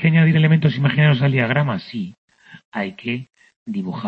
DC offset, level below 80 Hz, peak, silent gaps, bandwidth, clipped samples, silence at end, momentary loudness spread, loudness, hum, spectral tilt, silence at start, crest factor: under 0.1%; -58 dBFS; -4 dBFS; 2.18-2.28 s, 2.65-2.72 s, 3.56-3.66 s; 5.2 kHz; under 0.1%; 0 s; 15 LU; -18 LUFS; none; -9 dB/octave; 0 s; 14 dB